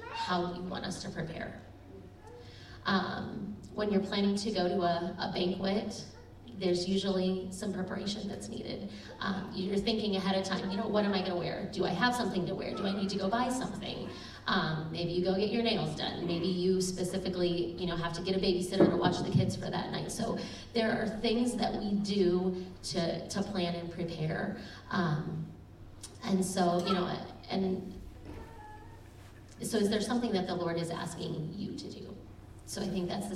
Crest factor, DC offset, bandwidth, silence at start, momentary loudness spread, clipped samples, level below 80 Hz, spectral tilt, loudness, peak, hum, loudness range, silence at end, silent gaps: 20 dB; under 0.1%; 14 kHz; 0 s; 18 LU; under 0.1%; -56 dBFS; -5.5 dB/octave; -33 LUFS; -12 dBFS; none; 5 LU; 0 s; none